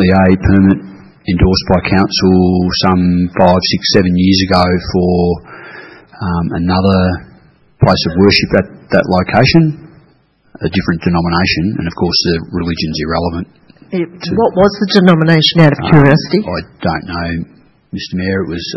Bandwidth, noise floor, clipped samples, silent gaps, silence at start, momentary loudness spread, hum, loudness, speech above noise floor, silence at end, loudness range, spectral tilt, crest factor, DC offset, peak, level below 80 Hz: 6 kHz; -51 dBFS; 0.3%; none; 0 s; 13 LU; none; -12 LUFS; 40 dB; 0 s; 5 LU; -6.5 dB/octave; 12 dB; under 0.1%; 0 dBFS; -34 dBFS